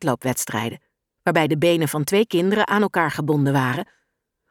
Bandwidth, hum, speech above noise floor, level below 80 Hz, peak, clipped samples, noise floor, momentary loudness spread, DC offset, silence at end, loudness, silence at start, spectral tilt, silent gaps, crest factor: 19.5 kHz; none; 54 dB; -62 dBFS; -4 dBFS; under 0.1%; -74 dBFS; 8 LU; under 0.1%; 0.65 s; -21 LUFS; 0 s; -5 dB/octave; none; 18 dB